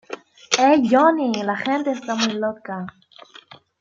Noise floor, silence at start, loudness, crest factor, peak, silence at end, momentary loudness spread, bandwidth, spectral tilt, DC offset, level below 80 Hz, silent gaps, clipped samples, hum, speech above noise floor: -47 dBFS; 0.1 s; -19 LUFS; 20 dB; 0 dBFS; 0.9 s; 18 LU; 7.8 kHz; -3.5 dB/octave; under 0.1%; -68 dBFS; none; under 0.1%; none; 28 dB